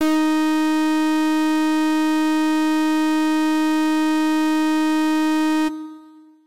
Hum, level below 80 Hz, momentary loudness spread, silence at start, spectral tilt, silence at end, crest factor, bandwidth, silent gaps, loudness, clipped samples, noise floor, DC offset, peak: none; -72 dBFS; 0 LU; 0 s; -2.5 dB/octave; 0 s; 6 dB; 16 kHz; none; -19 LUFS; under 0.1%; -46 dBFS; 1%; -14 dBFS